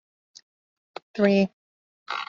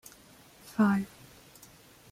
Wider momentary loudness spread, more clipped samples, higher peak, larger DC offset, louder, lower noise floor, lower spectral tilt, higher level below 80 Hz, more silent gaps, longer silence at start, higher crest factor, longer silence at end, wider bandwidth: about the same, 24 LU vs 26 LU; neither; first, -8 dBFS vs -14 dBFS; neither; first, -24 LUFS vs -29 LUFS; first, under -90 dBFS vs -56 dBFS; about the same, -5.5 dB/octave vs -6.5 dB/octave; about the same, -70 dBFS vs -68 dBFS; first, 1.53-2.06 s vs none; first, 1.15 s vs 0.7 s; about the same, 20 dB vs 18 dB; second, 0.05 s vs 1.05 s; second, 7.2 kHz vs 16 kHz